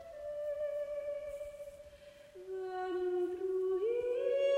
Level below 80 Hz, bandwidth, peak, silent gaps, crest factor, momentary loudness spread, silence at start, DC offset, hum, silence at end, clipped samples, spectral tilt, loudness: -68 dBFS; 12 kHz; -22 dBFS; none; 14 dB; 18 LU; 0 s; under 0.1%; none; 0 s; under 0.1%; -5.5 dB/octave; -37 LUFS